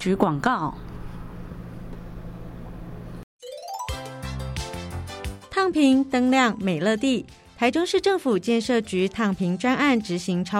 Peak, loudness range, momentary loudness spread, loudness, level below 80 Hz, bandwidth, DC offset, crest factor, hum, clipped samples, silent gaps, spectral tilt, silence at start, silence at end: -6 dBFS; 15 LU; 19 LU; -23 LUFS; -44 dBFS; 15 kHz; under 0.1%; 20 dB; none; under 0.1%; 3.23-3.39 s; -5.5 dB/octave; 0 s; 0 s